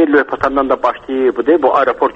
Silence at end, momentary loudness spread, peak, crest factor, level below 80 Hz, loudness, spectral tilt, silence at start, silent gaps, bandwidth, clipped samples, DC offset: 0 s; 5 LU; 0 dBFS; 14 dB; -44 dBFS; -14 LUFS; -6.5 dB/octave; 0 s; none; 7.2 kHz; under 0.1%; under 0.1%